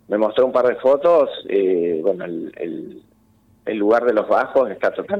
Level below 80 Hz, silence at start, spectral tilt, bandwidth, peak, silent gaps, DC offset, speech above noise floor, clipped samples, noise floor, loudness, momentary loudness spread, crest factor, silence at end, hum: -62 dBFS; 0.1 s; -7 dB/octave; 6 kHz; -6 dBFS; none; under 0.1%; 38 dB; under 0.1%; -56 dBFS; -19 LUFS; 13 LU; 12 dB; 0 s; none